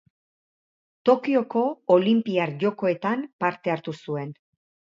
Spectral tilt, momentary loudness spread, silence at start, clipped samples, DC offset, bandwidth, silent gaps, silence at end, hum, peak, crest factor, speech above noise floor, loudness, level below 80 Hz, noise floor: -8 dB/octave; 11 LU; 1.05 s; under 0.1%; under 0.1%; 7.4 kHz; 3.33-3.39 s; 0.6 s; none; -6 dBFS; 20 dB; over 67 dB; -24 LUFS; -74 dBFS; under -90 dBFS